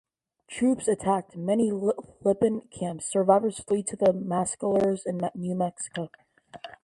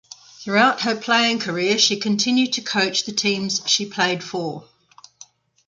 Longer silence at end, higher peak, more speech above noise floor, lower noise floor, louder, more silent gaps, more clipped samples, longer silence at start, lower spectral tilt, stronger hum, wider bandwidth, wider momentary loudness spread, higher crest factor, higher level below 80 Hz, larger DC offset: second, 0.1 s vs 1.05 s; second, -6 dBFS vs -2 dBFS; second, 25 dB vs 30 dB; about the same, -51 dBFS vs -51 dBFS; second, -27 LUFS vs -19 LUFS; neither; neither; about the same, 0.5 s vs 0.4 s; first, -6 dB/octave vs -2.5 dB/octave; neither; first, 11.5 kHz vs 9.6 kHz; about the same, 11 LU vs 10 LU; about the same, 20 dB vs 20 dB; about the same, -64 dBFS vs -68 dBFS; neither